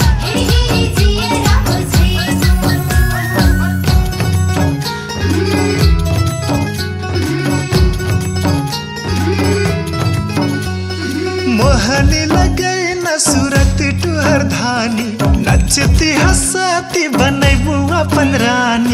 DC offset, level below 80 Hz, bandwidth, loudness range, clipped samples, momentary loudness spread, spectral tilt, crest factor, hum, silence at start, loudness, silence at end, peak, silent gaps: under 0.1%; -20 dBFS; 16.5 kHz; 3 LU; under 0.1%; 6 LU; -5 dB/octave; 12 dB; none; 0 s; -13 LUFS; 0 s; 0 dBFS; none